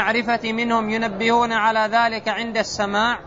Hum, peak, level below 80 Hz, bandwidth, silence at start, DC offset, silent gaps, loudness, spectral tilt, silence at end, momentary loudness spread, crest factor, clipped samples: none; -6 dBFS; -52 dBFS; 7.8 kHz; 0 s; under 0.1%; none; -20 LUFS; -3.5 dB/octave; 0 s; 5 LU; 14 dB; under 0.1%